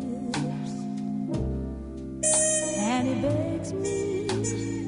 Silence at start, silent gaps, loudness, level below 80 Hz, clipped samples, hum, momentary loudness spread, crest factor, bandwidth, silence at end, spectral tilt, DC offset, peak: 0 s; none; -27 LUFS; -44 dBFS; under 0.1%; none; 11 LU; 16 dB; 11 kHz; 0 s; -4.5 dB/octave; under 0.1%; -12 dBFS